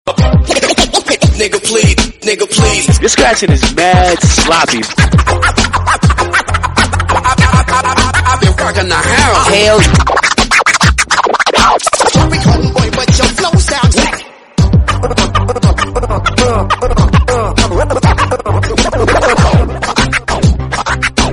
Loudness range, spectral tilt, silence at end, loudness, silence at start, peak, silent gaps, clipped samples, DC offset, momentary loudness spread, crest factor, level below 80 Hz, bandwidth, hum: 3 LU; -4 dB/octave; 0 s; -9 LUFS; 0.05 s; 0 dBFS; none; 0.1%; under 0.1%; 5 LU; 10 dB; -18 dBFS; 12 kHz; none